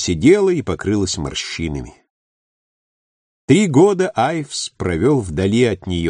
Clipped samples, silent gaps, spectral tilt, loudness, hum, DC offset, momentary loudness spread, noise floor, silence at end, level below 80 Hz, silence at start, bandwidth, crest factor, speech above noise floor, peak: under 0.1%; 2.10-3.48 s; -5.5 dB/octave; -17 LUFS; none; under 0.1%; 11 LU; under -90 dBFS; 0 s; -40 dBFS; 0 s; 10 kHz; 16 dB; over 74 dB; -2 dBFS